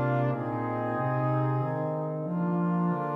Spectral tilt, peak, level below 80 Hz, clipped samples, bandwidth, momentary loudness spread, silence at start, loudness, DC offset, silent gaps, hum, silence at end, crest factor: -11 dB/octave; -16 dBFS; -66 dBFS; under 0.1%; 4 kHz; 4 LU; 0 s; -29 LUFS; under 0.1%; none; none; 0 s; 12 dB